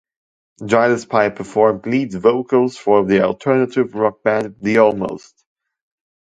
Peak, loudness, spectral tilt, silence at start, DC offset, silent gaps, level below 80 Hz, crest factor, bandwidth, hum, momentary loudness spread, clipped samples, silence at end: 0 dBFS; -17 LUFS; -6.5 dB/octave; 0.6 s; under 0.1%; none; -56 dBFS; 18 dB; 9.2 kHz; none; 6 LU; under 0.1%; 1.1 s